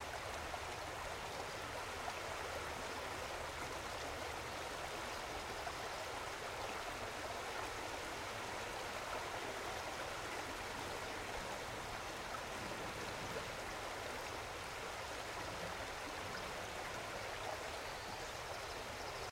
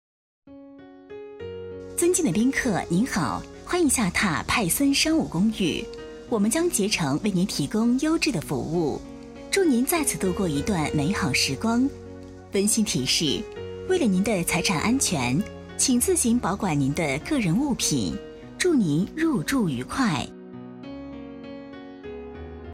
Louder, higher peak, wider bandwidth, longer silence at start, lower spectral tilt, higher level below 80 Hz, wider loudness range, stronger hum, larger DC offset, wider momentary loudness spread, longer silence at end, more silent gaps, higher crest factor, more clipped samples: second, -44 LUFS vs -23 LUFS; second, -28 dBFS vs -10 dBFS; about the same, 16 kHz vs 16 kHz; second, 0 s vs 0.45 s; second, -2.5 dB/octave vs -4 dB/octave; second, -60 dBFS vs -46 dBFS; about the same, 1 LU vs 3 LU; neither; neither; second, 1 LU vs 18 LU; about the same, 0 s vs 0 s; neither; about the same, 16 dB vs 16 dB; neither